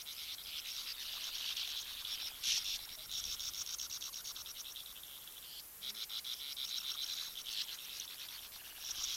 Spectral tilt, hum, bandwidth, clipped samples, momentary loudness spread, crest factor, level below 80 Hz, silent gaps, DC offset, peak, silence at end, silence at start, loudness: 2.5 dB/octave; none; 16.5 kHz; under 0.1%; 9 LU; 22 dB; -70 dBFS; none; under 0.1%; -22 dBFS; 0 s; 0 s; -41 LUFS